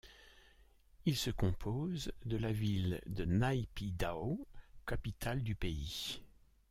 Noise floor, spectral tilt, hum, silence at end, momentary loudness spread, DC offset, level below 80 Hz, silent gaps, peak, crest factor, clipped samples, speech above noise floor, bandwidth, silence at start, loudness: -65 dBFS; -6 dB/octave; none; 0.45 s; 8 LU; under 0.1%; -50 dBFS; none; -20 dBFS; 18 dB; under 0.1%; 28 dB; 16 kHz; 0.05 s; -39 LUFS